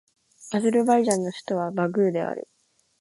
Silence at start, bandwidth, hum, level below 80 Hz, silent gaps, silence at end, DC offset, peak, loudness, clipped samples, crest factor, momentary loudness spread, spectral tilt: 0.4 s; 11.5 kHz; none; -70 dBFS; none; 0.6 s; under 0.1%; -4 dBFS; -24 LUFS; under 0.1%; 22 dB; 10 LU; -5.5 dB/octave